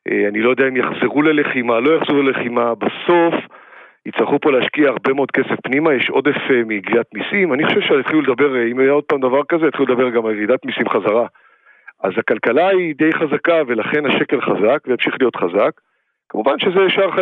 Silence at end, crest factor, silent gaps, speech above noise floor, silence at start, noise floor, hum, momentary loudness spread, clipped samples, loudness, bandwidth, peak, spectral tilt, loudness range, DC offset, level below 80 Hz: 0 s; 16 dB; none; 30 dB; 0.05 s; -45 dBFS; none; 4 LU; under 0.1%; -16 LUFS; 4.3 kHz; -2 dBFS; -8 dB/octave; 2 LU; under 0.1%; -72 dBFS